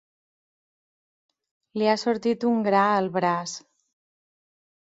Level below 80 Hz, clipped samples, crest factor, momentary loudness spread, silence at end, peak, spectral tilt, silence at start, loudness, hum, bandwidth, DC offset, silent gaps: -72 dBFS; under 0.1%; 20 dB; 14 LU; 1.3 s; -8 dBFS; -5 dB/octave; 1.75 s; -23 LUFS; none; 7.8 kHz; under 0.1%; none